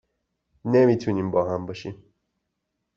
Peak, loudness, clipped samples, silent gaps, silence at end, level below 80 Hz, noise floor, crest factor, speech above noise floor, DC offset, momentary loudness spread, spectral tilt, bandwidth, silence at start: -8 dBFS; -22 LUFS; under 0.1%; none; 1.05 s; -62 dBFS; -79 dBFS; 18 dB; 57 dB; under 0.1%; 17 LU; -8 dB/octave; 7.2 kHz; 0.65 s